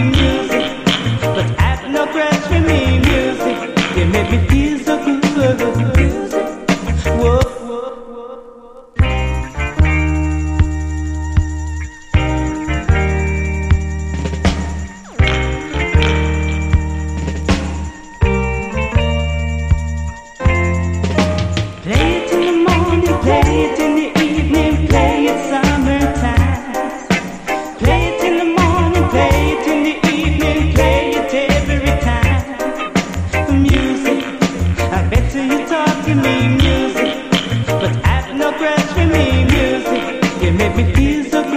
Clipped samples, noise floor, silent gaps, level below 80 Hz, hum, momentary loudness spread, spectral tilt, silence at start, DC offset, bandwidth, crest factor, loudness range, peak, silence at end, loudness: under 0.1%; -37 dBFS; none; -22 dBFS; none; 8 LU; -6 dB/octave; 0 s; under 0.1%; 15 kHz; 14 dB; 4 LU; 0 dBFS; 0 s; -15 LUFS